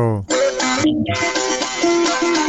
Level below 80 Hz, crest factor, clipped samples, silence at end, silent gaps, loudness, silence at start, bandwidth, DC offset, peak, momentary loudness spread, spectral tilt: -48 dBFS; 12 dB; under 0.1%; 0 s; none; -17 LUFS; 0 s; 8.4 kHz; under 0.1%; -6 dBFS; 2 LU; -3.5 dB/octave